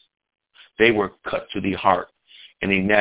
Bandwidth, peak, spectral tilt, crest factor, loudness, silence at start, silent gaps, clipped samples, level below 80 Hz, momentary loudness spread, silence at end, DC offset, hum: 4 kHz; -2 dBFS; -9 dB/octave; 22 dB; -21 LUFS; 0.8 s; none; under 0.1%; -52 dBFS; 11 LU; 0 s; under 0.1%; none